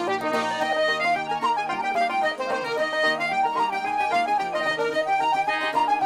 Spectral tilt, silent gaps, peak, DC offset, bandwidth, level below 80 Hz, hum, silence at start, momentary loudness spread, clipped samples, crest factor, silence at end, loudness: -3 dB/octave; none; -12 dBFS; under 0.1%; 15.5 kHz; -64 dBFS; none; 0 s; 3 LU; under 0.1%; 10 dB; 0 s; -24 LUFS